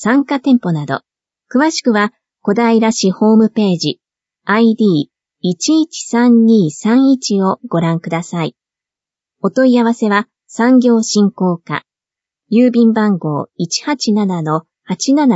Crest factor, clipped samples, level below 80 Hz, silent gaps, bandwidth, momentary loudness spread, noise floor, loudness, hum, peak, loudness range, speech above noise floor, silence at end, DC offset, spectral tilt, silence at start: 14 dB; under 0.1%; -64 dBFS; none; 8 kHz; 11 LU; -88 dBFS; -14 LUFS; none; 0 dBFS; 2 LU; 75 dB; 0 s; under 0.1%; -5.5 dB/octave; 0 s